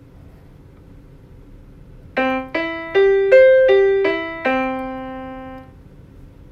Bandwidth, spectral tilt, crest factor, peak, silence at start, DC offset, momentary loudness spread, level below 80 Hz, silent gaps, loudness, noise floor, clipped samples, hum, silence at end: 6.2 kHz; -6.5 dB/octave; 18 dB; 0 dBFS; 1.5 s; under 0.1%; 20 LU; -46 dBFS; none; -16 LUFS; -43 dBFS; under 0.1%; none; 0.25 s